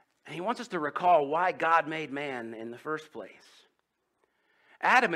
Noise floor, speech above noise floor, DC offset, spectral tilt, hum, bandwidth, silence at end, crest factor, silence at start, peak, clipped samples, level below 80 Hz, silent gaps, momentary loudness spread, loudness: -78 dBFS; 49 dB; under 0.1%; -4.5 dB/octave; none; 13 kHz; 0 s; 24 dB; 0.25 s; -6 dBFS; under 0.1%; -82 dBFS; none; 18 LU; -29 LUFS